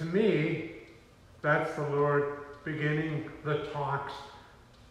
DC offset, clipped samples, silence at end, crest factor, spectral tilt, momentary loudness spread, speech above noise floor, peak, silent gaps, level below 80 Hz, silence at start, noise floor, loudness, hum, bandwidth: under 0.1%; under 0.1%; 0.1 s; 18 dB; -7.5 dB/octave; 14 LU; 26 dB; -14 dBFS; none; -62 dBFS; 0 s; -56 dBFS; -31 LUFS; none; 11 kHz